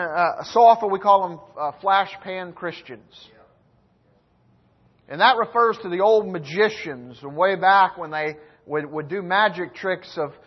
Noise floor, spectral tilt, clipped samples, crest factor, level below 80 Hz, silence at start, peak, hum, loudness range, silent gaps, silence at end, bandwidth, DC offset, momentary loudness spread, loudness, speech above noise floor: -61 dBFS; -5 dB/octave; under 0.1%; 18 dB; -68 dBFS; 0 s; -4 dBFS; none; 8 LU; none; 0.15 s; 6.2 kHz; under 0.1%; 16 LU; -20 LUFS; 40 dB